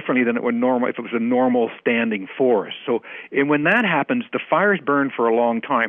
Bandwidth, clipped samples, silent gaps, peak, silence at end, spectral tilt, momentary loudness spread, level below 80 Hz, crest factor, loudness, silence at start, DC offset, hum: 3.7 kHz; under 0.1%; none; -6 dBFS; 0 s; -8 dB/octave; 7 LU; -70 dBFS; 14 dB; -20 LUFS; 0 s; under 0.1%; none